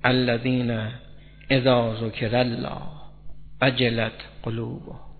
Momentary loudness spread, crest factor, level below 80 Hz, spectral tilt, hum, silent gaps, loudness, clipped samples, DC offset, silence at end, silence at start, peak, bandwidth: 14 LU; 24 dB; -48 dBFS; -9.5 dB/octave; none; none; -24 LUFS; under 0.1%; under 0.1%; 0.05 s; 0.05 s; -2 dBFS; 4.6 kHz